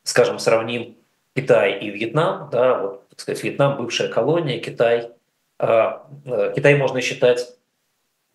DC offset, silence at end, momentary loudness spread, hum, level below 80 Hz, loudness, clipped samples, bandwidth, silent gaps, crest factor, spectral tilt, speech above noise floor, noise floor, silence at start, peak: under 0.1%; 0.85 s; 12 LU; none; -74 dBFS; -20 LUFS; under 0.1%; 12.5 kHz; none; 18 dB; -5 dB/octave; 51 dB; -71 dBFS; 0.05 s; -2 dBFS